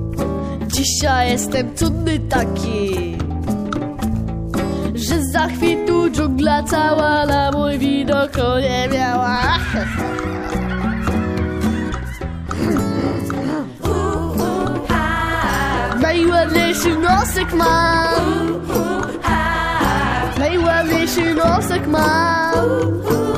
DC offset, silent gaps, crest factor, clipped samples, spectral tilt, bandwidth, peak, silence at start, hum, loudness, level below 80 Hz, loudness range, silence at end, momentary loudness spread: under 0.1%; none; 16 dB; under 0.1%; -5 dB/octave; 15.5 kHz; -2 dBFS; 0 s; none; -18 LUFS; -30 dBFS; 5 LU; 0 s; 7 LU